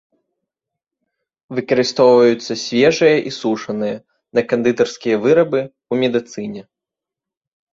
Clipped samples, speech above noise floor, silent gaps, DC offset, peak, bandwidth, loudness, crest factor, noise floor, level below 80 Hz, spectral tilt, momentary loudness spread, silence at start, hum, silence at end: under 0.1%; 70 dB; none; under 0.1%; -2 dBFS; 7.6 kHz; -16 LUFS; 16 dB; -86 dBFS; -60 dBFS; -5 dB/octave; 14 LU; 1.5 s; none; 1.1 s